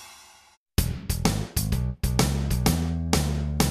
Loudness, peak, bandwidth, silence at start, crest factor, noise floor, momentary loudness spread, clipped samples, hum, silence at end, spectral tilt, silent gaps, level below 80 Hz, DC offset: -26 LUFS; -8 dBFS; 14 kHz; 0 s; 18 dB; -52 dBFS; 4 LU; under 0.1%; none; 0 s; -5 dB/octave; 0.57-0.66 s; -32 dBFS; under 0.1%